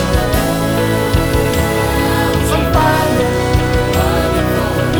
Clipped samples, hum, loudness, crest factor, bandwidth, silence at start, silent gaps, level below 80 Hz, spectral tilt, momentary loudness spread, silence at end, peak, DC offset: under 0.1%; none; -14 LUFS; 12 dB; 19.5 kHz; 0 s; none; -22 dBFS; -5.5 dB/octave; 2 LU; 0 s; 0 dBFS; under 0.1%